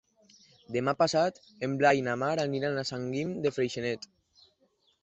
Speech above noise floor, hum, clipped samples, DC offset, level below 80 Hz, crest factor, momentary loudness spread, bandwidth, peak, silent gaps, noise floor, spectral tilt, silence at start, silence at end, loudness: 41 dB; none; under 0.1%; under 0.1%; -68 dBFS; 20 dB; 10 LU; 8.4 kHz; -10 dBFS; none; -70 dBFS; -5 dB/octave; 0.7 s; 1.05 s; -30 LUFS